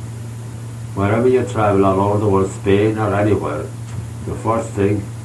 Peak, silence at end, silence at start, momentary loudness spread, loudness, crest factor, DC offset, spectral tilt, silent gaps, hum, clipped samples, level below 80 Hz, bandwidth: -2 dBFS; 0 s; 0 s; 15 LU; -17 LUFS; 16 dB; under 0.1%; -7.5 dB/octave; none; none; under 0.1%; -44 dBFS; 12.5 kHz